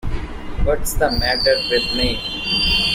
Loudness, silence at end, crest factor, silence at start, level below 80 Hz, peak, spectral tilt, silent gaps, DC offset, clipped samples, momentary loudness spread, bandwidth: -18 LUFS; 0 s; 16 dB; 0.05 s; -26 dBFS; -4 dBFS; -3.5 dB/octave; none; under 0.1%; under 0.1%; 11 LU; 16 kHz